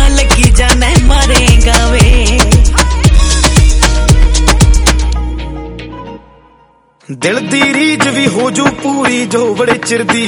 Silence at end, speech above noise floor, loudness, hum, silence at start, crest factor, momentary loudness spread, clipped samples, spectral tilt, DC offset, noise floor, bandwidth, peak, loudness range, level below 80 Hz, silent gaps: 0 s; 35 dB; -9 LUFS; none; 0 s; 8 dB; 12 LU; 3%; -4 dB/octave; under 0.1%; -46 dBFS; 18 kHz; 0 dBFS; 6 LU; -12 dBFS; none